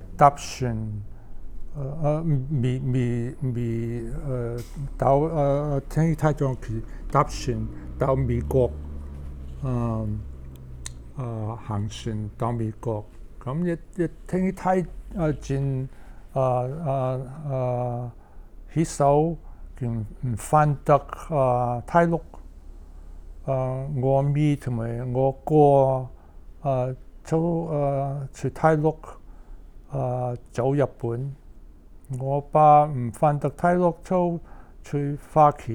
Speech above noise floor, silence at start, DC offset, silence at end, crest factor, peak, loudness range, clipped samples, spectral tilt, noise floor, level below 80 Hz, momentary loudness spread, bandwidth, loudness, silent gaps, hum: 22 dB; 0 s; under 0.1%; 0 s; 22 dB; -2 dBFS; 7 LU; under 0.1%; -8 dB/octave; -45 dBFS; -40 dBFS; 15 LU; 13 kHz; -25 LUFS; none; none